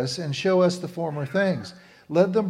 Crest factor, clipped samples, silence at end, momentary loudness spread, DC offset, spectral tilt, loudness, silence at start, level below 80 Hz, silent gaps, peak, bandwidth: 18 dB; under 0.1%; 0 s; 9 LU; under 0.1%; -6 dB/octave; -24 LUFS; 0 s; -68 dBFS; none; -6 dBFS; 12.5 kHz